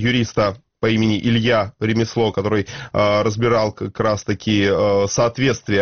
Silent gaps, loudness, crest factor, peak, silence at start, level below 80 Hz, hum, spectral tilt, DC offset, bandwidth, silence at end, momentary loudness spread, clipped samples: none; -19 LUFS; 14 dB; -4 dBFS; 0 s; -46 dBFS; none; -5 dB/octave; 0.3%; 6.8 kHz; 0 s; 5 LU; under 0.1%